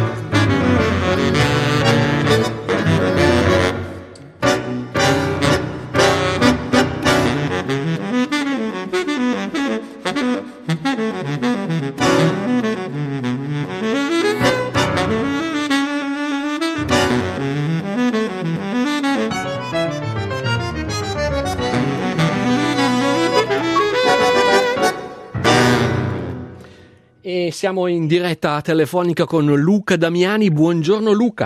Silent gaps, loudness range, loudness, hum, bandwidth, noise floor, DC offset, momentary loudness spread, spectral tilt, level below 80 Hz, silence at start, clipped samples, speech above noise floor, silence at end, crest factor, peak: none; 5 LU; -18 LUFS; none; 15.5 kHz; -47 dBFS; under 0.1%; 8 LU; -5.5 dB/octave; -44 dBFS; 0 s; under 0.1%; 31 dB; 0 s; 16 dB; -2 dBFS